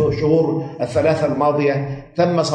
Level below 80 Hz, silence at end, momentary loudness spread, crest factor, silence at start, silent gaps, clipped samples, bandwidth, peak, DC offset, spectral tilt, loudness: -46 dBFS; 0 s; 7 LU; 14 dB; 0 s; none; under 0.1%; 10 kHz; -4 dBFS; under 0.1%; -7 dB/octave; -18 LUFS